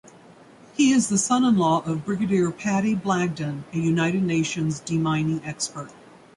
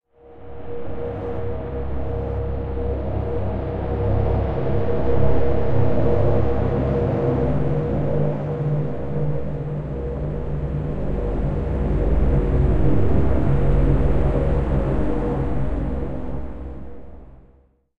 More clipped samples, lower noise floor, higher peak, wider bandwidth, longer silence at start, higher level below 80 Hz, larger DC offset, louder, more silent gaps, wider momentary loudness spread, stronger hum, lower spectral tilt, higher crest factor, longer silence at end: neither; second, -49 dBFS vs -55 dBFS; second, -8 dBFS vs -4 dBFS; first, 11.5 kHz vs 4.7 kHz; about the same, 0.05 s vs 0 s; second, -58 dBFS vs -26 dBFS; neither; about the same, -23 LUFS vs -23 LUFS; neither; about the same, 10 LU vs 9 LU; neither; second, -5 dB/octave vs -10.5 dB/octave; about the same, 14 dB vs 16 dB; first, 0.45 s vs 0 s